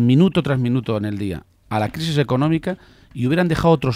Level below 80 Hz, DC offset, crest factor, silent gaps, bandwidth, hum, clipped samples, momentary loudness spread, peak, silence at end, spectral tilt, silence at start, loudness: -44 dBFS; under 0.1%; 16 dB; none; 14.5 kHz; none; under 0.1%; 12 LU; -4 dBFS; 0 s; -7.5 dB/octave; 0 s; -20 LUFS